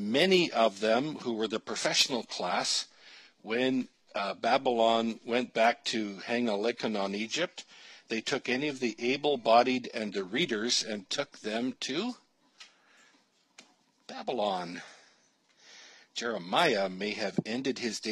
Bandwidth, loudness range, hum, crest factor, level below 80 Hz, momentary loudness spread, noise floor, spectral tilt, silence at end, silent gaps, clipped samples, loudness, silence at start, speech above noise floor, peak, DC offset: 14.5 kHz; 9 LU; none; 22 dB; -84 dBFS; 11 LU; -68 dBFS; -3 dB/octave; 0 s; none; under 0.1%; -30 LUFS; 0 s; 38 dB; -10 dBFS; under 0.1%